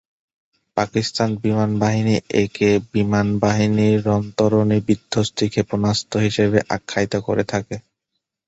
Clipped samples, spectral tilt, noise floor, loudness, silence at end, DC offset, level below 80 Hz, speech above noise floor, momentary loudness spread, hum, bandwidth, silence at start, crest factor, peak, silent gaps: under 0.1%; -6 dB/octave; -78 dBFS; -19 LUFS; 0.65 s; under 0.1%; -48 dBFS; 60 dB; 5 LU; none; 8.2 kHz; 0.75 s; 18 dB; -2 dBFS; none